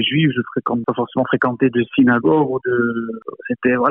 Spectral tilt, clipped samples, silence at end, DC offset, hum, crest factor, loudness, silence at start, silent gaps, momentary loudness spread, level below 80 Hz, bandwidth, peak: -10 dB/octave; under 0.1%; 0 s; under 0.1%; none; 14 dB; -18 LUFS; 0 s; none; 9 LU; -58 dBFS; 3.8 kHz; -4 dBFS